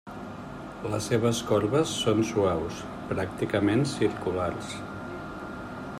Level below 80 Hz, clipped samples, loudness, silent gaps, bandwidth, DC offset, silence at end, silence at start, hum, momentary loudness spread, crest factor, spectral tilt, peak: -54 dBFS; under 0.1%; -28 LUFS; none; 14.5 kHz; under 0.1%; 0 s; 0.05 s; none; 13 LU; 18 dB; -5.5 dB/octave; -10 dBFS